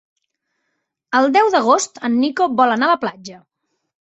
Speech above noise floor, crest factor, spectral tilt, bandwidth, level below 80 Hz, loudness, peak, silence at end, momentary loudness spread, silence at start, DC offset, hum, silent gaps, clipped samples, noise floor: 58 dB; 16 dB; -3 dB/octave; 8.2 kHz; -68 dBFS; -16 LUFS; -2 dBFS; 0.8 s; 10 LU; 1.1 s; under 0.1%; none; none; under 0.1%; -74 dBFS